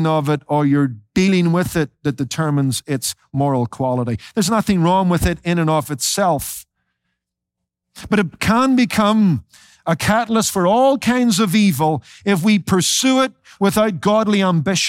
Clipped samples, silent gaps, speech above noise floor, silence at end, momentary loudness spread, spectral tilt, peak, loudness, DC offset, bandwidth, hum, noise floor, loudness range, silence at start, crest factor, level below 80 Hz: under 0.1%; none; 64 dB; 0 s; 7 LU; -5 dB/octave; -4 dBFS; -17 LUFS; under 0.1%; 16.5 kHz; none; -80 dBFS; 4 LU; 0 s; 14 dB; -42 dBFS